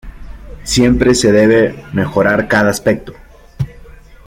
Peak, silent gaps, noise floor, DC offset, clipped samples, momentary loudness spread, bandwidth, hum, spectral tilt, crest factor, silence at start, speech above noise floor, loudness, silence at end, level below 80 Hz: 0 dBFS; none; -37 dBFS; under 0.1%; under 0.1%; 15 LU; 16.5 kHz; none; -5 dB/octave; 14 dB; 0.05 s; 25 dB; -12 LUFS; 0.35 s; -32 dBFS